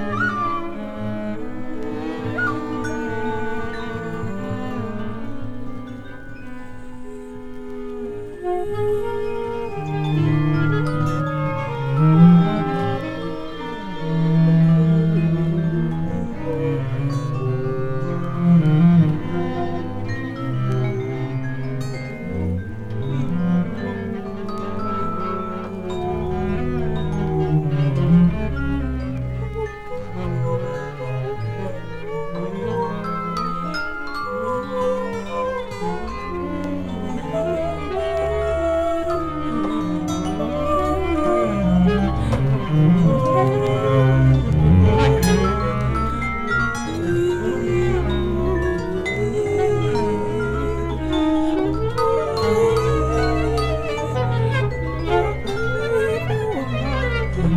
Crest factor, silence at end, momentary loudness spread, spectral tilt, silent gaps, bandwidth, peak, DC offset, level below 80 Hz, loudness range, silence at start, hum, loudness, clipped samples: 18 dB; 0 s; 13 LU; -8 dB/octave; none; 13 kHz; -2 dBFS; under 0.1%; -34 dBFS; 9 LU; 0 s; none; -21 LUFS; under 0.1%